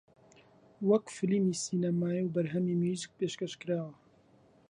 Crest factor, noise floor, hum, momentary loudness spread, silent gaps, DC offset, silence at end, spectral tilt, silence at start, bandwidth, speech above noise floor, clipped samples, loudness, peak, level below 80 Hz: 18 dB; -63 dBFS; none; 7 LU; none; under 0.1%; 0.75 s; -6 dB/octave; 0.8 s; 10.5 kHz; 32 dB; under 0.1%; -32 LUFS; -16 dBFS; -74 dBFS